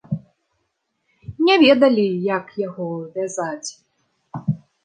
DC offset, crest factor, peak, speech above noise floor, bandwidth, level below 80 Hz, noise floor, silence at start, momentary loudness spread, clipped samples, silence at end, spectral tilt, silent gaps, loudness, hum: under 0.1%; 18 dB; -2 dBFS; 54 dB; 9.8 kHz; -60 dBFS; -73 dBFS; 0.1 s; 18 LU; under 0.1%; 0.3 s; -5.5 dB/octave; none; -19 LUFS; none